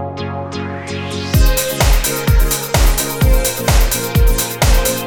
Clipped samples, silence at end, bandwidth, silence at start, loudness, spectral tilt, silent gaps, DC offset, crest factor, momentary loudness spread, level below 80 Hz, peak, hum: under 0.1%; 0 s; 17.5 kHz; 0 s; -16 LUFS; -4 dB/octave; none; under 0.1%; 14 dB; 9 LU; -16 dBFS; 0 dBFS; none